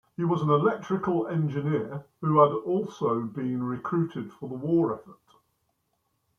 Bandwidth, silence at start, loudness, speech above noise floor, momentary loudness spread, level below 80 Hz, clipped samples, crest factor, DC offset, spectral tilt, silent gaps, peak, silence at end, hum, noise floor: 6.6 kHz; 0.2 s; -27 LUFS; 49 dB; 11 LU; -68 dBFS; under 0.1%; 22 dB; under 0.1%; -9 dB/octave; none; -6 dBFS; 1.25 s; none; -75 dBFS